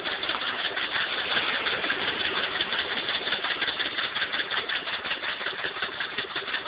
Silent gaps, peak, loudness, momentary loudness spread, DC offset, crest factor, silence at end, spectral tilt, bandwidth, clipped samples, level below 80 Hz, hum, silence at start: none; -12 dBFS; -27 LUFS; 4 LU; under 0.1%; 18 dB; 0 s; 1.5 dB/octave; 5.4 kHz; under 0.1%; -62 dBFS; none; 0 s